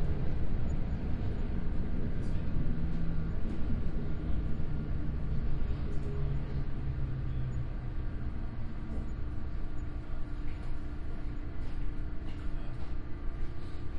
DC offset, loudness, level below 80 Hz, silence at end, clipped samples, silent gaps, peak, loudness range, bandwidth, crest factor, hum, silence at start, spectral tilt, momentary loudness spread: under 0.1%; -38 LUFS; -34 dBFS; 0 s; under 0.1%; none; -18 dBFS; 5 LU; 4.8 kHz; 12 dB; none; 0 s; -9 dB/octave; 6 LU